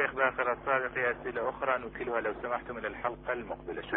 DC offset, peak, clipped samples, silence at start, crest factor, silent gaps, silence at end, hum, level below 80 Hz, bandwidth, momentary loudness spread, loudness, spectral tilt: under 0.1%; -12 dBFS; under 0.1%; 0 s; 20 dB; none; 0 s; none; -56 dBFS; 4 kHz; 8 LU; -33 LUFS; -8.5 dB/octave